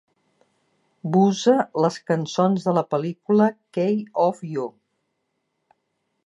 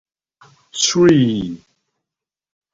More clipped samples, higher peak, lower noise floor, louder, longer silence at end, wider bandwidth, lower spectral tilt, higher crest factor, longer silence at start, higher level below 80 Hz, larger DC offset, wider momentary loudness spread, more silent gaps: neither; second, -6 dBFS vs -2 dBFS; second, -75 dBFS vs -86 dBFS; second, -22 LUFS vs -15 LUFS; first, 1.55 s vs 1.15 s; first, 10.5 kHz vs 7.8 kHz; first, -6.5 dB/octave vs -4.5 dB/octave; about the same, 18 dB vs 18 dB; first, 1.05 s vs 0.75 s; second, -74 dBFS vs -52 dBFS; neither; second, 10 LU vs 19 LU; neither